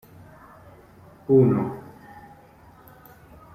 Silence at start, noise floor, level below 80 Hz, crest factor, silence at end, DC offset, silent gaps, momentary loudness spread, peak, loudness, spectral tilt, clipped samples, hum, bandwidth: 1.3 s; -51 dBFS; -58 dBFS; 20 dB; 1.75 s; under 0.1%; none; 28 LU; -6 dBFS; -21 LUFS; -11 dB/octave; under 0.1%; none; 15 kHz